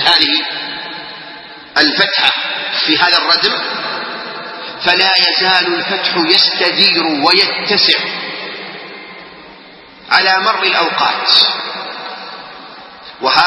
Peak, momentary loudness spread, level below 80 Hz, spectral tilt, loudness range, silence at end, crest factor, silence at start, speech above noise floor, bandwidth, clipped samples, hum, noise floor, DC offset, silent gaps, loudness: 0 dBFS; 20 LU; -60 dBFS; -3 dB/octave; 4 LU; 0 s; 14 dB; 0 s; 25 dB; 11 kHz; 0.1%; none; -38 dBFS; under 0.1%; none; -11 LUFS